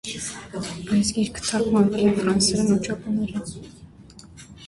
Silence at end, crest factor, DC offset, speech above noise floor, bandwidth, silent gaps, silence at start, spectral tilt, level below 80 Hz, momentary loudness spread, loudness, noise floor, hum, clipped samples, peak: 0 s; 16 dB; under 0.1%; 23 dB; 11.5 kHz; none; 0.05 s; -4.5 dB/octave; -48 dBFS; 13 LU; -23 LUFS; -46 dBFS; none; under 0.1%; -6 dBFS